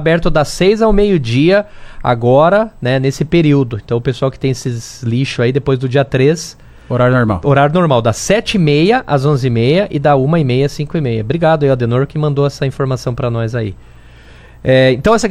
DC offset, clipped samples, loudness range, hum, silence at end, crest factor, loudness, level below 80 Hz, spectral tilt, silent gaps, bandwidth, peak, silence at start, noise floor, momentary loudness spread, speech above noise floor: under 0.1%; under 0.1%; 4 LU; none; 0 s; 12 dB; -13 LUFS; -32 dBFS; -6.5 dB/octave; none; 13 kHz; 0 dBFS; 0 s; -38 dBFS; 7 LU; 26 dB